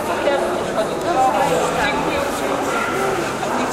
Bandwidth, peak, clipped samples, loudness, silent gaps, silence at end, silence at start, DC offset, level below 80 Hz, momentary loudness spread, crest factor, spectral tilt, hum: 16 kHz; -6 dBFS; under 0.1%; -19 LUFS; none; 0 s; 0 s; under 0.1%; -44 dBFS; 4 LU; 14 dB; -4 dB/octave; none